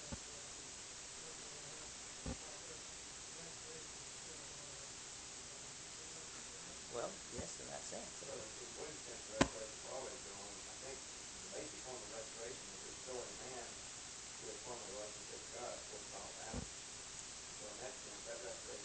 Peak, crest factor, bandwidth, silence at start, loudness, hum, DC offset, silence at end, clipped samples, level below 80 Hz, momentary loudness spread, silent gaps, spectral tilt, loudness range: -12 dBFS; 36 dB; 13 kHz; 0 s; -48 LUFS; none; under 0.1%; 0 s; under 0.1%; -66 dBFS; 3 LU; none; -2 dB/octave; 4 LU